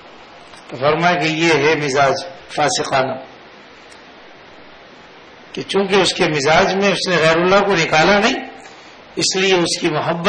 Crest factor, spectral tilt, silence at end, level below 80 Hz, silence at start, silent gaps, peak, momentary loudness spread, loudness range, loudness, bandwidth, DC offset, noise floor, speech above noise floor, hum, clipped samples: 16 dB; -3.5 dB/octave; 0 s; -50 dBFS; 0.05 s; none; -2 dBFS; 12 LU; 9 LU; -15 LUFS; 10.5 kHz; under 0.1%; -41 dBFS; 26 dB; none; under 0.1%